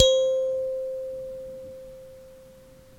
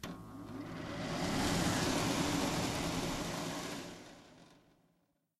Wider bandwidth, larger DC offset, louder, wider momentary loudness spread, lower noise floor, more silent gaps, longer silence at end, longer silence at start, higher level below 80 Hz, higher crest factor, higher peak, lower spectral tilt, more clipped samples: about the same, 14 kHz vs 14 kHz; neither; first, -27 LUFS vs -36 LUFS; first, 23 LU vs 16 LU; second, -50 dBFS vs -77 dBFS; neither; second, 0.4 s vs 0.85 s; about the same, 0 s vs 0 s; about the same, -54 dBFS vs -54 dBFS; first, 26 dB vs 16 dB; first, 0 dBFS vs -22 dBFS; second, -2 dB/octave vs -4 dB/octave; neither